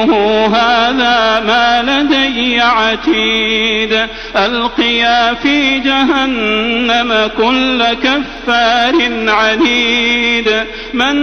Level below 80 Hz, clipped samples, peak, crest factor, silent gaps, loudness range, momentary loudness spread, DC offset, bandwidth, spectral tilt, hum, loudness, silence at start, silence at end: -36 dBFS; under 0.1%; 0 dBFS; 12 dB; none; 1 LU; 4 LU; under 0.1%; 6.6 kHz; -3.5 dB/octave; none; -11 LUFS; 0 s; 0 s